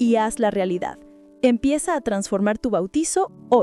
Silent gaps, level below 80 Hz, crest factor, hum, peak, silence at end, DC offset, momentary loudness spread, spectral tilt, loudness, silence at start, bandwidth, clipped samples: none; -50 dBFS; 16 dB; none; -6 dBFS; 0 s; under 0.1%; 4 LU; -5 dB/octave; -22 LUFS; 0 s; 13 kHz; under 0.1%